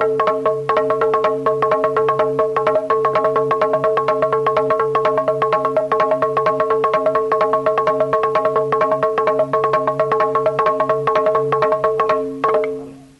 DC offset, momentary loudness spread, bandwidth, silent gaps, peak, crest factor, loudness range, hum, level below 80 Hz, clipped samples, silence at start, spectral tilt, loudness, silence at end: under 0.1%; 1 LU; 11 kHz; none; -6 dBFS; 12 dB; 0 LU; none; -56 dBFS; under 0.1%; 0 s; -6.5 dB/octave; -17 LUFS; 0.15 s